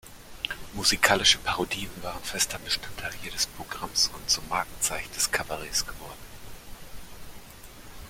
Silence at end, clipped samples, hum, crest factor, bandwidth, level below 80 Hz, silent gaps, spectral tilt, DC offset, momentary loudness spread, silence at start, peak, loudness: 0 s; under 0.1%; none; 28 dB; 16.5 kHz; -48 dBFS; none; -1 dB/octave; under 0.1%; 25 LU; 0.05 s; -2 dBFS; -26 LUFS